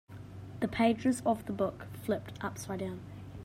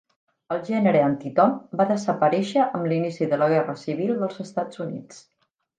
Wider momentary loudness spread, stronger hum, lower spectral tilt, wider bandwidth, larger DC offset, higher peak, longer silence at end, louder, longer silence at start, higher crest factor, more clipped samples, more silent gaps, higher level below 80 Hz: first, 18 LU vs 10 LU; neither; about the same, -6 dB/octave vs -7 dB/octave; first, 16 kHz vs 9.4 kHz; neither; second, -16 dBFS vs -6 dBFS; second, 0 s vs 0.6 s; second, -34 LUFS vs -23 LUFS; second, 0.1 s vs 0.5 s; about the same, 18 dB vs 18 dB; neither; neither; first, -60 dBFS vs -72 dBFS